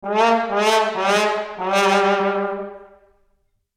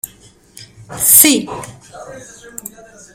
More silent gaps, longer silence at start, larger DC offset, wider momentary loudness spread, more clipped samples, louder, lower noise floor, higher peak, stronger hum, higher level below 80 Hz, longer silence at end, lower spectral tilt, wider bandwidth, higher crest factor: neither; about the same, 0.05 s vs 0.05 s; neither; second, 9 LU vs 27 LU; second, under 0.1% vs 0.3%; second, -18 LUFS vs -8 LUFS; first, -65 dBFS vs -46 dBFS; second, -4 dBFS vs 0 dBFS; neither; second, -60 dBFS vs -52 dBFS; about the same, 0.9 s vs 0.95 s; first, -3.5 dB/octave vs -1 dB/octave; second, 16 kHz vs over 20 kHz; about the same, 16 dB vs 18 dB